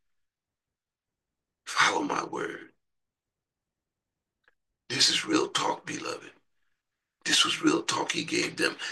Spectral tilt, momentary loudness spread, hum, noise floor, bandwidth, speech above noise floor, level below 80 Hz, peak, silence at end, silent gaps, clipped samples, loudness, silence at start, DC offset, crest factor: -1.5 dB/octave; 14 LU; none; under -90 dBFS; 12.5 kHz; over 62 dB; -78 dBFS; -8 dBFS; 0 s; none; under 0.1%; -27 LUFS; 1.65 s; under 0.1%; 24 dB